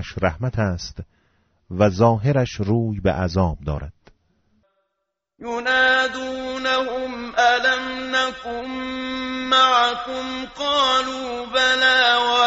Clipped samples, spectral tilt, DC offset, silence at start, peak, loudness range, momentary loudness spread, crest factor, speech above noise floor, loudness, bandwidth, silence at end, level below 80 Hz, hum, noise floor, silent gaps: under 0.1%; -2.5 dB/octave; under 0.1%; 0 s; -4 dBFS; 5 LU; 14 LU; 18 dB; 58 dB; -20 LUFS; 8 kHz; 0 s; -42 dBFS; none; -79 dBFS; none